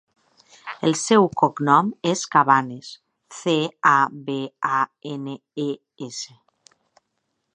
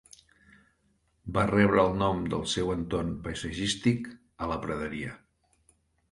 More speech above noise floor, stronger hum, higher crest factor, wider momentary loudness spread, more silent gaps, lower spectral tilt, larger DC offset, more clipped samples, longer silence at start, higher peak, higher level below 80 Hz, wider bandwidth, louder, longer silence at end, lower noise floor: first, 54 dB vs 43 dB; neither; about the same, 20 dB vs 22 dB; first, 17 LU vs 14 LU; neither; about the same, -4.5 dB/octave vs -5.5 dB/octave; neither; neither; second, 0.65 s vs 1.25 s; first, -2 dBFS vs -8 dBFS; second, -70 dBFS vs -48 dBFS; about the same, 11 kHz vs 11.5 kHz; first, -21 LUFS vs -29 LUFS; first, 1.3 s vs 0.95 s; first, -75 dBFS vs -71 dBFS